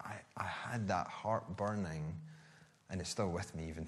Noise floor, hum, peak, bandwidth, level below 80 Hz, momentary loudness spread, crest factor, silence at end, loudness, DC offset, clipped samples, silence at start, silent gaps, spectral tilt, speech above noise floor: -63 dBFS; none; -22 dBFS; 12.5 kHz; -62 dBFS; 10 LU; 18 dB; 0 s; -41 LUFS; under 0.1%; under 0.1%; 0 s; none; -5.5 dB/octave; 24 dB